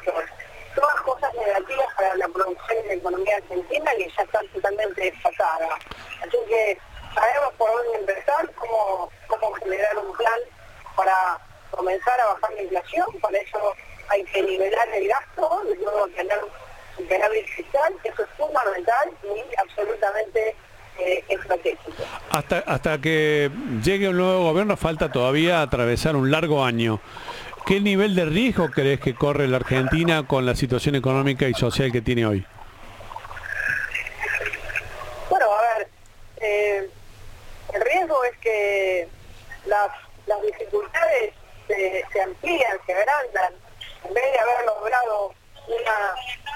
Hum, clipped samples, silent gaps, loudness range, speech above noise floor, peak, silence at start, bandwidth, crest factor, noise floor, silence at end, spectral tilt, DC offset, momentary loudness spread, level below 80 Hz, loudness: none; under 0.1%; none; 4 LU; 23 dB; 0 dBFS; 0 s; 17 kHz; 22 dB; -45 dBFS; 0 s; -5.5 dB/octave; under 0.1%; 11 LU; -46 dBFS; -23 LUFS